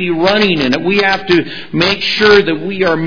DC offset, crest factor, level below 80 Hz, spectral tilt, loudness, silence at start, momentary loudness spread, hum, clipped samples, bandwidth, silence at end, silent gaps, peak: 2%; 12 dB; -42 dBFS; -5.5 dB/octave; -12 LUFS; 0 s; 6 LU; none; 0.3%; 5.4 kHz; 0 s; none; 0 dBFS